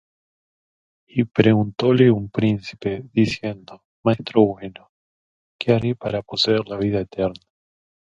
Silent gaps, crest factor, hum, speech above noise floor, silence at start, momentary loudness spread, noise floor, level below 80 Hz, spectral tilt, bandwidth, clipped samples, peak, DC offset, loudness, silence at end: 3.85-4.03 s, 4.89-5.59 s; 22 dB; none; over 70 dB; 1.15 s; 11 LU; under -90 dBFS; -52 dBFS; -7 dB/octave; 7.8 kHz; under 0.1%; 0 dBFS; under 0.1%; -21 LUFS; 0.65 s